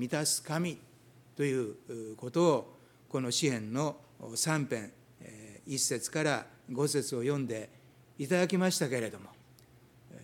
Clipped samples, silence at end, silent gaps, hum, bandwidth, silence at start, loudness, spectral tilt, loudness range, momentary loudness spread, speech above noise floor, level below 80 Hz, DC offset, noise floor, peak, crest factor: under 0.1%; 0 s; none; none; 18 kHz; 0 s; -32 LUFS; -4 dB/octave; 2 LU; 20 LU; 28 dB; -76 dBFS; under 0.1%; -60 dBFS; -14 dBFS; 20 dB